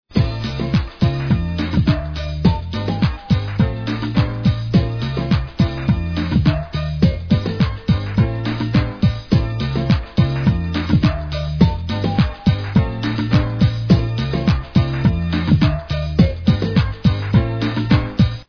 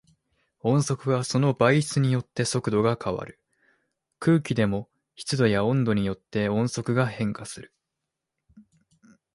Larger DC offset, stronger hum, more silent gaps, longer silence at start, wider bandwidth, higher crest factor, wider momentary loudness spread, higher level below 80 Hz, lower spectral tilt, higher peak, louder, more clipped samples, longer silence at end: first, 0.3% vs under 0.1%; neither; neither; second, 0.1 s vs 0.65 s; second, 5.4 kHz vs 11.5 kHz; about the same, 18 dB vs 20 dB; second, 5 LU vs 11 LU; first, -28 dBFS vs -56 dBFS; first, -8.5 dB/octave vs -6 dB/octave; first, 0 dBFS vs -6 dBFS; first, -18 LUFS vs -25 LUFS; neither; second, 0.05 s vs 0.75 s